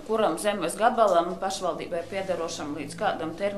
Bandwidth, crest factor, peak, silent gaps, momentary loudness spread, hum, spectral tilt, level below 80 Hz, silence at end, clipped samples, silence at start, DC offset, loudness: 13.5 kHz; 20 dB; -8 dBFS; none; 10 LU; none; -4 dB/octave; -56 dBFS; 0 s; under 0.1%; 0 s; under 0.1%; -27 LUFS